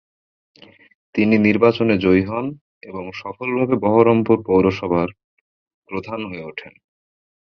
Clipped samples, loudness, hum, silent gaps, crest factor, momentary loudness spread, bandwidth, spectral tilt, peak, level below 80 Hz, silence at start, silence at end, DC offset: under 0.1%; -18 LUFS; none; 2.61-2.81 s, 5.24-5.82 s; 18 dB; 16 LU; 6.4 kHz; -8.5 dB/octave; -2 dBFS; -48 dBFS; 1.15 s; 0.9 s; under 0.1%